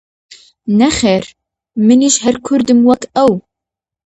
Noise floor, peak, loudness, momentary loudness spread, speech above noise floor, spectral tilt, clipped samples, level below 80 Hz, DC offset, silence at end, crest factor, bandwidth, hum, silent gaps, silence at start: -84 dBFS; 0 dBFS; -12 LUFS; 13 LU; 73 dB; -4.5 dB/octave; under 0.1%; -44 dBFS; under 0.1%; 0.75 s; 14 dB; 9 kHz; none; none; 0.65 s